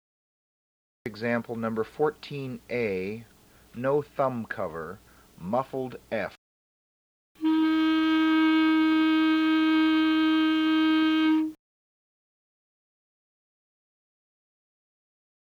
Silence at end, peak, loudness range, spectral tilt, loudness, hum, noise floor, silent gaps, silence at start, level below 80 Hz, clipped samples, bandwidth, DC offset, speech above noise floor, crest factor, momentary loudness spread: 3.95 s; -12 dBFS; 10 LU; -6.5 dB/octave; -25 LUFS; none; under -90 dBFS; 6.38-7.35 s; 1.05 s; -64 dBFS; under 0.1%; 6.4 kHz; under 0.1%; over 60 dB; 16 dB; 14 LU